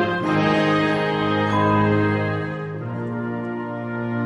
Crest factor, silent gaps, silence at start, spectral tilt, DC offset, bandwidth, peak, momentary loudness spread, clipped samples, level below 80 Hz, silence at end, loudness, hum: 16 dB; none; 0 s; -7.5 dB/octave; under 0.1%; 11.5 kHz; -6 dBFS; 10 LU; under 0.1%; -52 dBFS; 0 s; -21 LUFS; none